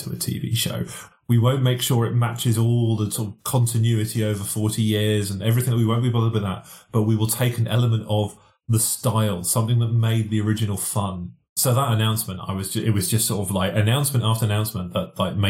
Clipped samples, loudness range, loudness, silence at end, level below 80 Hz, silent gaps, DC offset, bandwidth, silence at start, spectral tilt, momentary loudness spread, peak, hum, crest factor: under 0.1%; 1 LU; -22 LUFS; 0 s; -56 dBFS; 11.49-11.56 s; under 0.1%; 17 kHz; 0 s; -5 dB/octave; 7 LU; -6 dBFS; none; 16 dB